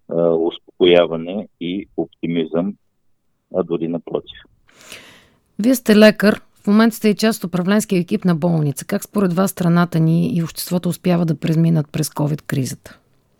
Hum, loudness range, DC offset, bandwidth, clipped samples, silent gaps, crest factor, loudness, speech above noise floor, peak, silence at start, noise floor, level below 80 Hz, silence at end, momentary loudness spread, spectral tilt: none; 9 LU; under 0.1%; 17.5 kHz; under 0.1%; none; 18 dB; -18 LUFS; 45 dB; 0 dBFS; 0.1 s; -62 dBFS; -56 dBFS; 0.45 s; 13 LU; -6 dB/octave